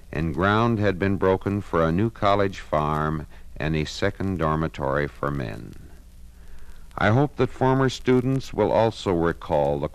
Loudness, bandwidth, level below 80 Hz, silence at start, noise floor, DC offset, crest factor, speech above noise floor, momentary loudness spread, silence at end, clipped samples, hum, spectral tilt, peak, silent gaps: -23 LUFS; 14 kHz; -40 dBFS; 0.05 s; -44 dBFS; under 0.1%; 16 dB; 21 dB; 8 LU; 0 s; under 0.1%; none; -7 dB/octave; -6 dBFS; none